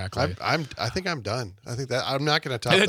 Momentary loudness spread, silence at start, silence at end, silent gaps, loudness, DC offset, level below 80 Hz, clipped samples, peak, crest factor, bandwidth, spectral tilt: 8 LU; 0 s; 0 s; none; -26 LUFS; under 0.1%; -56 dBFS; under 0.1%; -4 dBFS; 22 dB; 16 kHz; -4.5 dB/octave